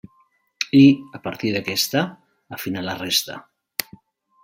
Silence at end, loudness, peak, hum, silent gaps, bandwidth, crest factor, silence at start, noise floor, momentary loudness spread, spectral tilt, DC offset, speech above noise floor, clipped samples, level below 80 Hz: 0.6 s; -20 LUFS; 0 dBFS; none; none; 16.5 kHz; 22 dB; 0.6 s; -62 dBFS; 18 LU; -4.5 dB/octave; under 0.1%; 42 dB; under 0.1%; -62 dBFS